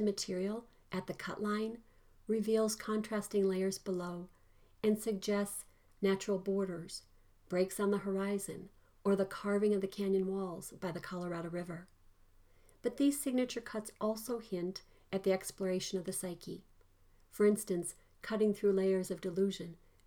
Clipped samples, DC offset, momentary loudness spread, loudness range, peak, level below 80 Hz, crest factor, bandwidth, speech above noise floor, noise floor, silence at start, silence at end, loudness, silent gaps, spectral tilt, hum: under 0.1%; under 0.1%; 13 LU; 3 LU; -20 dBFS; -66 dBFS; 16 dB; 19 kHz; 30 dB; -65 dBFS; 0 s; 0.3 s; -36 LUFS; none; -5.5 dB/octave; none